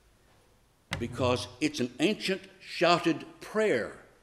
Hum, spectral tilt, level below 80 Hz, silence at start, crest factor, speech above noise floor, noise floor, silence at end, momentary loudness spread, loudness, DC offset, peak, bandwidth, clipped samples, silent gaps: none; -4.5 dB/octave; -60 dBFS; 0.9 s; 22 dB; 35 dB; -64 dBFS; 0.2 s; 11 LU; -30 LUFS; under 0.1%; -10 dBFS; 14.5 kHz; under 0.1%; none